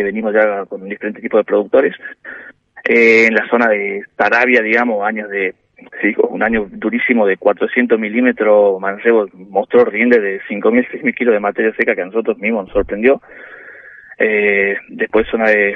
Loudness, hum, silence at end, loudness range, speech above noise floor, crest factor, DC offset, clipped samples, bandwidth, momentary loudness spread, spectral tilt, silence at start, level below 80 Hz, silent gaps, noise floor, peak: -14 LUFS; none; 0 s; 4 LU; 24 dB; 14 dB; under 0.1%; under 0.1%; 7.4 kHz; 11 LU; -6.5 dB/octave; 0 s; -46 dBFS; none; -38 dBFS; 0 dBFS